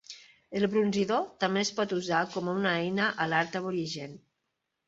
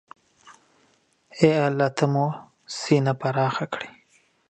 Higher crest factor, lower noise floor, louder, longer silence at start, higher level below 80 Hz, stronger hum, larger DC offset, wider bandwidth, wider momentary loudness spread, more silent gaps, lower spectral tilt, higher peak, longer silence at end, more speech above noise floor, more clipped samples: about the same, 20 dB vs 22 dB; first, -82 dBFS vs -64 dBFS; second, -29 LUFS vs -23 LUFS; second, 0.1 s vs 0.45 s; second, -70 dBFS vs -64 dBFS; neither; neither; second, 8 kHz vs 9 kHz; second, 11 LU vs 16 LU; neither; second, -4.5 dB/octave vs -6.5 dB/octave; second, -10 dBFS vs -2 dBFS; about the same, 0.7 s vs 0.6 s; first, 53 dB vs 42 dB; neither